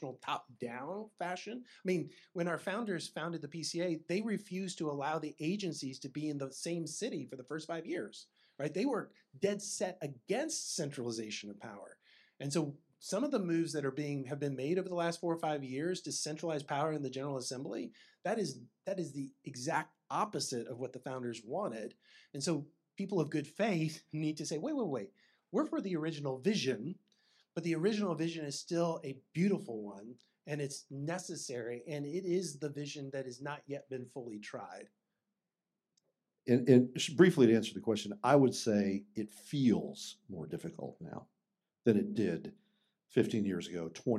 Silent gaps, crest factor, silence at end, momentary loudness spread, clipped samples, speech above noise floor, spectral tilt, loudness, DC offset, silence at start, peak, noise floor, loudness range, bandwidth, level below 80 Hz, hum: none; 24 dB; 0 s; 13 LU; under 0.1%; over 54 dB; -5.5 dB/octave; -36 LUFS; under 0.1%; 0 s; -12 dBFS; under -90 dBFS; 9 LU; 14 kHz; -84 dBFS; none